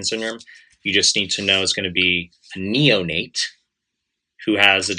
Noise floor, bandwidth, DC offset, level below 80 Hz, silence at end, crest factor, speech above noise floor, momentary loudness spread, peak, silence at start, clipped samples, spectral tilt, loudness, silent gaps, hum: -79 dBFS; 12.5 kHz; under 0.1%; -60 dBFS; 0 s; 20 dB; 59 dB; 14 LU; 0 dBFS; 0 s; under 0.1%; -2.5 dB/octave; -18 LUFS; none; none